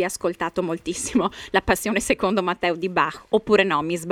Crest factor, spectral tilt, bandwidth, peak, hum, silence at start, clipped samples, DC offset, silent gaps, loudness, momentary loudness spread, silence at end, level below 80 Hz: 18 dB; -4 dB/octave; 17 kHz; -4 dBFS; none; 0 s; under 0.1%; under 0.1%; none; -22 LUFS; 7 LU; 0 s; -46 dBFS